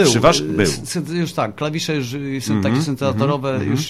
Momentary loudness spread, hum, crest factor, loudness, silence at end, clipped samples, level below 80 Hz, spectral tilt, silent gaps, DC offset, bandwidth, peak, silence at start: 8 LU; none; 18 dB; -19 LUFS; 0 s; under 0.1%; -44 dBFS; -5 dB/octave; none; under 0.1%; 15.5 kHz; 0 dBFS; 0 s